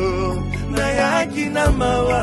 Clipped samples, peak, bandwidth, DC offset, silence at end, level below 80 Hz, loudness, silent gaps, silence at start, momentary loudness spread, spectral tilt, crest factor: under 0.1%; -2 dBFS; 12.5 kHz; under 0.1%; 0 s; -28 dBFS; -19 LUFS; none; 0 s; 6 LU; -5.5 dB/octave; 16 dB